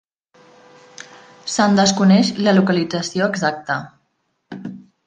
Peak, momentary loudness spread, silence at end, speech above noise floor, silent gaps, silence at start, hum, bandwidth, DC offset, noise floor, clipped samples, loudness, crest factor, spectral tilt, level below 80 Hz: -2 dBFS; 23 LU; 0.3 s; 53 dB; none; 1.45 s; none; 9.4 kHz; under 0.1%; -69 dBFS; under 0.1%; -17 LUFS; 18 dB; -5 dB/octave; -60 dBFS